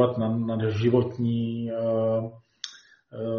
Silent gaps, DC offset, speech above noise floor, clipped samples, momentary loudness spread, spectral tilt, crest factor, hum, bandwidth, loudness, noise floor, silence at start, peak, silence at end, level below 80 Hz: none; under 0.1%; 23 dB; under 0.1%; 16 LU; -7.5 dB/octave; 18 dB; none; 6.8 kHz; -26 LUFS; -48 dBFS; 0 s; -8 dBFS; 0 s; -62 dBFS